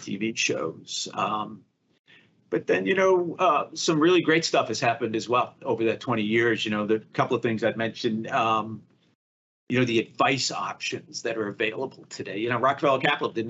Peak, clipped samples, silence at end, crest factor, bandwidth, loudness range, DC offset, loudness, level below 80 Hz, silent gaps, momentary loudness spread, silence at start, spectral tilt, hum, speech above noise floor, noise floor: -6 dBFS; under 0.1%; 0 s; 20 dB; 8.2 kHz; 4 LU; under 0.1%; -25 LUFS; -76 dBFS; 1.99-2.04 s, 9.15-9.67 s; 10 LU; 0 s; -4.5 dB/octave; none; over 65 dB; under -90 dBFS